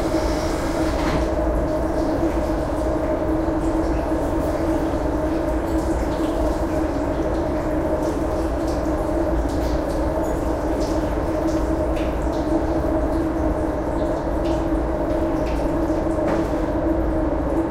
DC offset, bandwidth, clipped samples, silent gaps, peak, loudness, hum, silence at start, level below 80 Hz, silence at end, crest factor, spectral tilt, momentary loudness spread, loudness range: under 0.1%; 15.5 kHz; under 0.1%; none; -8 dBFS; -22 LUFS; none; 0 s; -28 dBFS; 0 s; 12 dB; -7 dB/octave; 2 LU; 1 LU